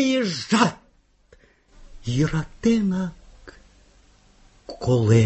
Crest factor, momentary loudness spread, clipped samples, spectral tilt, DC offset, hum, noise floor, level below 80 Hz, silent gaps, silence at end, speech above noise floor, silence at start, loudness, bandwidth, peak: 20 dB; 11 LU; under 0.1%; -6 dB/octave; under 0.1%; none; -59 dBFS; -48 dBFS; none; 0 s; 39 dB; 0 s; -23 LUFS; 8.4 kHz; -4 dBFS